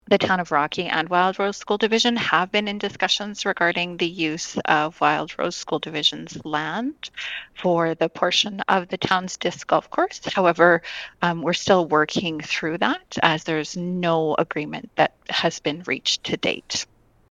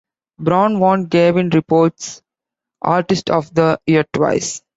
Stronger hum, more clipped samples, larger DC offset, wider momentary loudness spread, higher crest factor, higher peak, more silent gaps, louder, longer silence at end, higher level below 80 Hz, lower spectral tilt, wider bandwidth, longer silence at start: neither; neither; neither; about the same, 8 LU vs 7 LU; first, 22 dB vs 14 dB; about the same, 0 dBFS vs -2 dBFS; neither; second, -22 LUFS vs -16 LUFS; first, 0.45 s vs 0.2 s; second, -60 dBFS vs -54 dBFS; second, -3.5 dB/octave vs -6 dB/octave; first, 11 kHz vs 8 kHz; second, 0.05 s vs 0.4 s